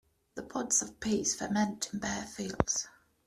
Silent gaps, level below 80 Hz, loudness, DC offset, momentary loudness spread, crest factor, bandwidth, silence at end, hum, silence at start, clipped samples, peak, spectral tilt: none; -56 dBFS; -32 LUFS; under 0.1%; 12 LU; 28 dB; 14 kHz; 0.4 s; none; 0.35 s; under 0.1%; -6 dBFS; -3 dB/octave